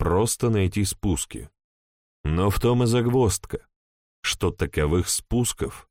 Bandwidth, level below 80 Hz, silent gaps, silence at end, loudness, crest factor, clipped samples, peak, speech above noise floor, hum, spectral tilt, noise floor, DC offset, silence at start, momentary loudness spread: 16.5 kHz; -38 dBFS; 1.64-2.24 s, 3.76-4.23 s; 0.1 s; -24 LUFS; 14 dB; under 0.1%; -10 dBFS; over 67 dB; none; -5 dB/octave; under -90 dBFS; under 0.1%; 0 s; 11 LU